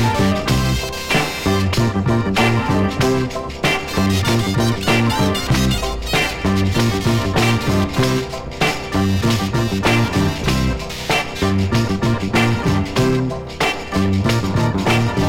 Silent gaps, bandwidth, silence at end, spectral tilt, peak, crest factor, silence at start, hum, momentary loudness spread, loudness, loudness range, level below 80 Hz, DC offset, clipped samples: none; 17 kHz; 0 s; -5.5 dB/octave; -2 dBFS; 14 dB; 0 s; none; 4 LU; -18 LUFS; 1 LU; -32 dBFS; under 0.1%; under 0.1%